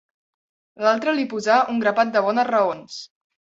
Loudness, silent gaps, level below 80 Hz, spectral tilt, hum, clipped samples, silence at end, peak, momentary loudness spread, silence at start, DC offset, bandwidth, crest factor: -20 LUFS; none; -70 dBFS; -4.5 dB/octave; none; under 0.1%; 0.35 s; -4 dBFS; 11 LU; 0.8 s; under 0.1%; 7.8 kHz; 18 dB